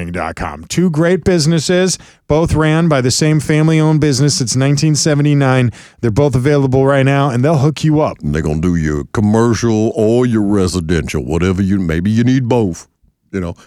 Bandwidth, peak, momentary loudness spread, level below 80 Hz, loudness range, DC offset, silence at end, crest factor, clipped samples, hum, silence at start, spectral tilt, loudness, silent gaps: 13.5 kHz; 0 dBFS; 7 LU; -34 dBFS; 2 LU; under 0.1%; 0.15 s; 12 dB; under 0.1%; none; 0 s; -6 dB/octave; -13 LUFS; none